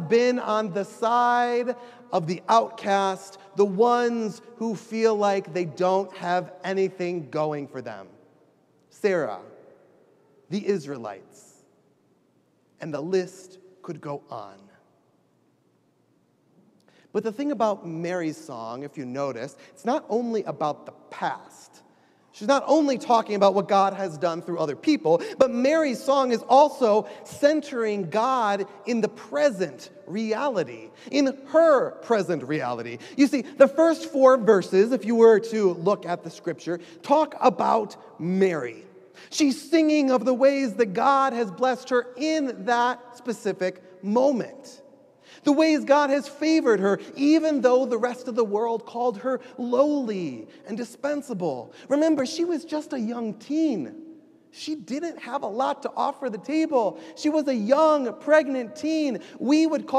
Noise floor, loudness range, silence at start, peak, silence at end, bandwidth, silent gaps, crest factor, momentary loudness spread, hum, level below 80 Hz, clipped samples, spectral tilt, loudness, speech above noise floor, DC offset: -65 dBFS; 11 LU; 0 s; -4 dBFS; 0 s; 13 kHz; none; 22 dB; 14 LU; none; -80 dBFS; under 0.1%; -5.5 dB/octave; -24 LUFS; 42 dB; under 0.1%